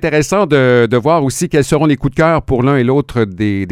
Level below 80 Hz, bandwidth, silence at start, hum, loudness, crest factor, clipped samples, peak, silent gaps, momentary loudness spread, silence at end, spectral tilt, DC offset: -34 dBFS; 16 kHz; 0 s; none; -13 LUFS; 12 dB; under 0.1%; 0 dBFS; none; 5 LU; 0 s; -6 dB/octave; under 0.1%